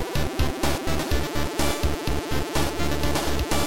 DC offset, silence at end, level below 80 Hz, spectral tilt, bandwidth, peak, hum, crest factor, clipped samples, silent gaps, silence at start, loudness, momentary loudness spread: 3%; 0 s; -30 dBFS; -4.5 dB/octave; 17 kHz; -10 dBFS; none; 14 dB; under 0.1%; none; 0 s; -26 LUFS; 3 LU